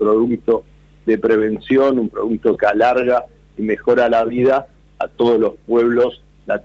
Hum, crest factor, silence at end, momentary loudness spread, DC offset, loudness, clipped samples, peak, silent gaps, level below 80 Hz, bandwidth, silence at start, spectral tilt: none; 14 dB; 0.05 s; 10 LU; under 0.1%; -17 LUFS; under 0.1%; -2 dBFS; none; -48 dBFS; 7.4 kHz; 0 s; -7.5 dB/octave